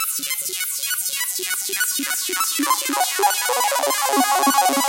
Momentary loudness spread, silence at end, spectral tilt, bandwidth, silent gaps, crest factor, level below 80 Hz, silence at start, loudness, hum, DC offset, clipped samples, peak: 6 LU; 0 s; 1 dB/octave; 17 kHz; none; 18 dB; -76 dBFS; 0 s; -19 LUFS; none; under 0.1%; under 0.1%; -2 dBFS